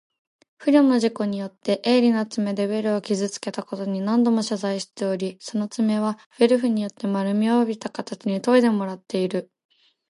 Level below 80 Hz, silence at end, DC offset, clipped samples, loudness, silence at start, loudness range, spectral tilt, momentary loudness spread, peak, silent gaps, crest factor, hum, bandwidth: -74 dBFS; 0.65 s; under 0.1%; under 0.1%; -23 LUFS; 0.6 s; 3 LU; -6 dB/octave; 10 LU; -6 dBFS; 6.26-6.31 s; 18 dB; none; 11.5 kHz